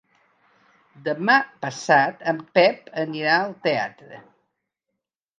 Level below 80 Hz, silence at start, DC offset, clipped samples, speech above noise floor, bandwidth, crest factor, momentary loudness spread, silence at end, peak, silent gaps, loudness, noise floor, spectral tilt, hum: -78 dBFS; 1.05 s; under 0.1%; under 0.1%; 60 dB; 9.4 kHz; 22 dB; 12 LU; 1.2 s; -2 dBFS; none; -21 LUFS; -82 dBFS; -4.5 dB/octave; none